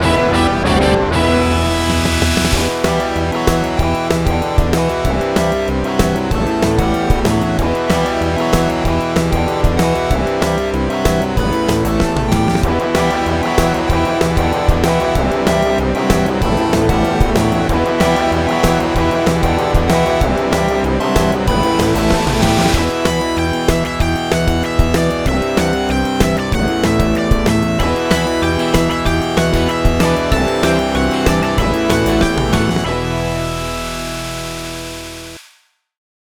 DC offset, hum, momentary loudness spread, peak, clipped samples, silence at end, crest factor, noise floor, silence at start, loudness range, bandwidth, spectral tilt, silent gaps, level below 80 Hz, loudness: under 0.1%; none; 3 LU; 0 dBFS; under 0.1%; 0.95 s; 14 dB; -54 dBFS; 0 s; 2 LU; over 20 kHz; -5.5 dB/octave; none; -24 dBFS; -15 LUFS